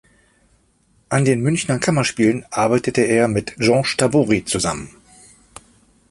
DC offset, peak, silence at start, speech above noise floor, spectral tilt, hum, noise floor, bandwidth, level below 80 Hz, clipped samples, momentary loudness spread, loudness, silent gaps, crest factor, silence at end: under 0.1%; -2 dBFS; 1.1 s; 42 dB; -5 dB/octave; none; -59 dBFS; 11.5 kHz; -48 dBFS; under 0.1%; 5 LU; -18 LUFS; none; 18 dB; 1.2 s